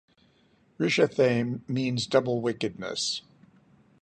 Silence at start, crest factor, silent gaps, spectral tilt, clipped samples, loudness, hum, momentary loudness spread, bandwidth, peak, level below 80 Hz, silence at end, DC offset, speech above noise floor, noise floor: 0.8 s; 20 dB; none; -5 dB/octave; under 0.1%; -27 LUFS; none; 8 LU; 11 kHz; -8 dBFS; -66 dBFS; 0.8 s; under 0.1%; 37 dB; -64 dBFS